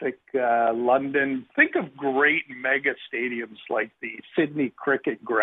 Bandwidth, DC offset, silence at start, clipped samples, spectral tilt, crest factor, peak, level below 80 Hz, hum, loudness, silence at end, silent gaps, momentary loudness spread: 4 kHz; under 0.1%; 0 s; under 0.1%; -8.5 dB/octave; 20 dB; -6 dBFS; -74 dBFS; none; -24 LUFS; 0 s; none; 9 LU